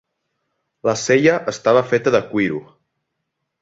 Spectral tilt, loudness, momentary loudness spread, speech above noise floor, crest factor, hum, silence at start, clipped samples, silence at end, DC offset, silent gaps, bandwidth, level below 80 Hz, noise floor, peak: -5 dB/octave; -17 LUFS; 8 LU; 59 dB; 18 dB; none; 0.85 s; under 0.1%; 1 s; under 0.1%; none; 7.8 kHz; -60 dBFS; -76 dBFS; -2 dBFS